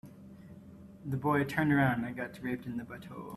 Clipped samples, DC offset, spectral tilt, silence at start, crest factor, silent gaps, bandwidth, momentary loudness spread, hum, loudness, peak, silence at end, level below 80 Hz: under 0.1%; under 0.1%; -7.5 dB/octave; 0.05 s; 18 dB; none; 14 kHz; 24 LU; none; -32 LUFS; -14 dBFS; 0 s; -64 dBFS